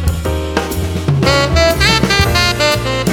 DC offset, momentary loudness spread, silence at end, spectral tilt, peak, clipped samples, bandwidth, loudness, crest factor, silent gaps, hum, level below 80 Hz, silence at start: under 0.1%; 8 LU; 0 s; -4.5 dB/octave; 0 dBFS; under 0.1%; 19 kHz; -13 LUFS; 14 dB; none; none; -24 dBFS; 0 s